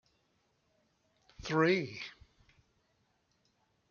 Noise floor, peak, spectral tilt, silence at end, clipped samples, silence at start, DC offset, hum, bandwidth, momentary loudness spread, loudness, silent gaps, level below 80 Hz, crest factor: -76 dBFS; -14 dBFS; -6 dB/octave; 1.8 s; under 0.1%; 1.4 s; under 0.1%; none; 7.2 kHz; 18 LU; -32 LUFS; none; -66 dBFS; 24 dB